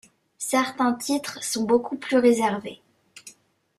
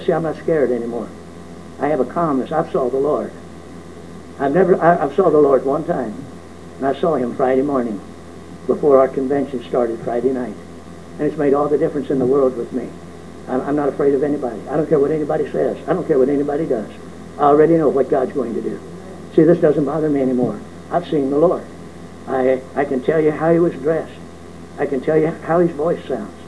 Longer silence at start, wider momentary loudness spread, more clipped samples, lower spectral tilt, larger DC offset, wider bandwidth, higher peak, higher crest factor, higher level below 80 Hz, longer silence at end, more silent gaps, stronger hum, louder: first, 0.4 s vs 0 s; second, 16 LU vs 22 LU; neither; second, -3.5 dB/octave vs -8 dB/octave; second, under 0.1% vs 0.7%; first, 15.5 kHz vs 11 kHz; second, -6 dBFS vs 0 dBFS; about the same, 18 dB vs 18 dB; second, -68 dBFS vs -52 dBFS; first, 0.5 s vs 0 s; neither; neither; second, -24 LUFS vs -18 LUFS